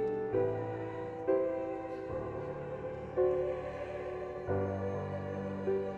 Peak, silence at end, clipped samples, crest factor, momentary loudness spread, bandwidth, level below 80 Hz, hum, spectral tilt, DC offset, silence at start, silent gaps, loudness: -18 dBFS; 0 s; under 0.1%; 18 dB; 8 LU; 7.4 kHz; -58 dBFS; none; -9 dB/octave; under 0.1%; 0 s; none; -36 LUFS